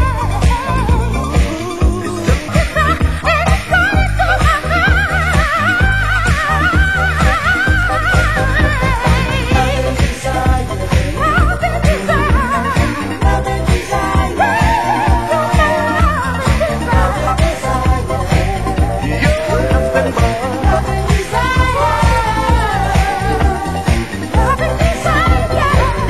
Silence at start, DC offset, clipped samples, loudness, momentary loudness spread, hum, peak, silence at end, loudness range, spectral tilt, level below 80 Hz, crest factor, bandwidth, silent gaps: 0 s; 2%; under 0.1%; -14 LUFS; 4 LU; none; 0 dBFS; 0 s; 2 LU; -5.5 dB/octave; -18 dBFS; 14 dB; 12.5 kHz; none